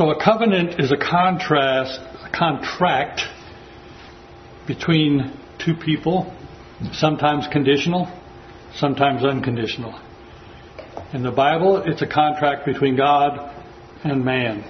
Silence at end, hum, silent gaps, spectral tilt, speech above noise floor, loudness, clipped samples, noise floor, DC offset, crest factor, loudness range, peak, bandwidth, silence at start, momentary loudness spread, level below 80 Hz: 0 s; none; none; -6.5 dB/octave; 23 dB; -20 LUFS; under 0.1%; -42 dBFS; under 0.1%; 20 dB; 4 LU; 0 dBFS; 6.4 kHz; 0 s; 20 LU; -50 dBFS